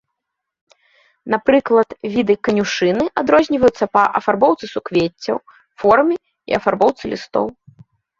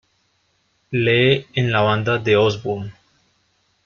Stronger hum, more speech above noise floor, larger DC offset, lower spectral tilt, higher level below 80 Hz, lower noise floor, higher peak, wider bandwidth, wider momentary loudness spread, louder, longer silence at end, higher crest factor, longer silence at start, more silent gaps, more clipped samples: neither; first, 63 dB vs 47 dB; neither; about the same, -5.5 dB/octave vs -6.5 dB/octave; about the same, -52 dBFS vs -54 dBFS; first, -79 dBFS vs -65 dBFS; about the same, 0 dBFS vs -2 dBFS; about the same, 7.6 kHz vs 7 kHz; about the same, 10 LU vs 11 LU; about the same, -17 LUFS vs -18 LUFS; second, 0.7 s vs 0.95 s; about the same, 16 dB vs 18 dB; first, 1.25 s vs 0.9 s; neither; neither